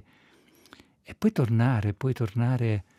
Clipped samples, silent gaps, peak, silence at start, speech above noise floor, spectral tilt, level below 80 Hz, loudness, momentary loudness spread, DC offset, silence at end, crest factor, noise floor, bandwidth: under 0.1%; none; -12 dBFS; 1.1 s; 35 dB; -8.5 dB/octave; -62 dBFS; -26 LUFS; 5 LU; under 0.1%; 0.15 s; 16 dB; -60 dBFS; 12.5 kHz